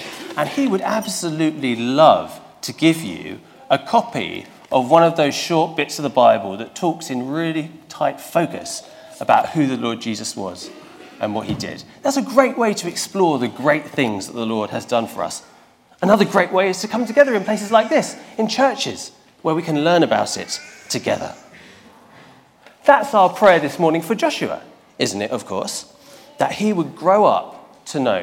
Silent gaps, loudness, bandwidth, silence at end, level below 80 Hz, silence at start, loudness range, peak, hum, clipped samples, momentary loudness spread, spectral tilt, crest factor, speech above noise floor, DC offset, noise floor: none; -19 LUFS; 17 kHz; 0 s; -62 dBFS; 0 s; 4 LU; 0 dBFS; none; under 0.1%; 14 LU; -4.5 dB/octave; 20 dB; 32 dB; under 0.1%; -51 dBFS